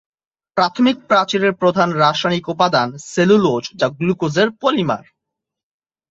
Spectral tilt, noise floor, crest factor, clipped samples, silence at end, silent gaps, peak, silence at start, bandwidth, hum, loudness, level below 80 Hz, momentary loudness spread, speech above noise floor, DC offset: -5.5 dB/octave; -82 dBFS; 16 dB; under 0.1%; 1.1 s; none; -2 dBFS; 0.55 s; 8 kHz; none; -17 LUFS; -58 dBFS; 6 LU; 66 dB; under 0.1%